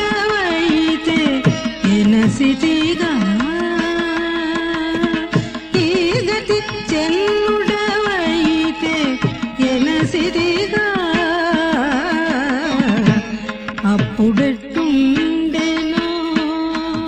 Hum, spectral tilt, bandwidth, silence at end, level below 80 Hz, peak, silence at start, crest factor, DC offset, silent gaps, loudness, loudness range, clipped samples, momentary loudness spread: none; -5.5 dB/octave; 9.4 kHz; 0 s; -42 dBFS; 0 dBFS; 0 s; 16 dB; under 0.1%; none; -17 LUFS; 2 LU; under 0.1%; 5 LU